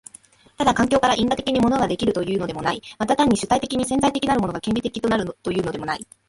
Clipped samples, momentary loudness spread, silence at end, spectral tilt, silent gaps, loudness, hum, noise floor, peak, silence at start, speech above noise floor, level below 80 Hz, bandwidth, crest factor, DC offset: under 0.1%; 7 LU; 0.25 s; -4.5 dB/octave; none; -21 LUFS; none; -50 dBFS; -4 dBFS; 0.6 s; 29 dB; -46 dBFS; 11.5 kHz; 16 dB; under 0.1%